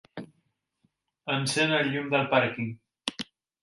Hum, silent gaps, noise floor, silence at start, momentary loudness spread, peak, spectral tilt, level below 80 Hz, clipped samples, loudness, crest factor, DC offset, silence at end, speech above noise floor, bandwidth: none; none; -75 dBFS; 0.15 s; 17 LU; -10 dBFS; -4 dB/octave; -70 dBFS; under 0.1%; -27 LUFS; 20 dB; under 0.1%; 0.4 s; 48 dB; 11.5 kHz